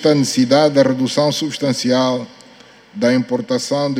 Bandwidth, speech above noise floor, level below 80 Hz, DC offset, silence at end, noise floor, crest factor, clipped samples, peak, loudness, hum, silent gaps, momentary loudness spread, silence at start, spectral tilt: 15 kHz; 29 dB; -62 dBFS; under 0.1%; 0 s; -44 dBFS; 16 dB; under 0.1%; 0 dBFS; -16 LUFS; none; none; 7 LU; 0 s; -5 dB/octave